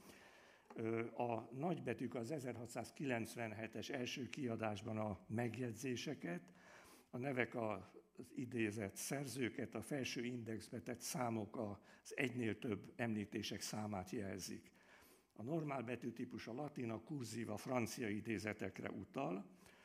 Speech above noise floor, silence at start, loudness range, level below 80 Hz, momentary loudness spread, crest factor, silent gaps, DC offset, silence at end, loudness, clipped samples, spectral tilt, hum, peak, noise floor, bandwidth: 23 dB; 0 s; 2 LU; -84 dBFS; 11 LU; 24 dB; none; under 0.1%; 0 s; -46 LUFS; under 0.1%; -5 dB/octave; none; -22 dBFS; -68 dBFS; 15.5 kHz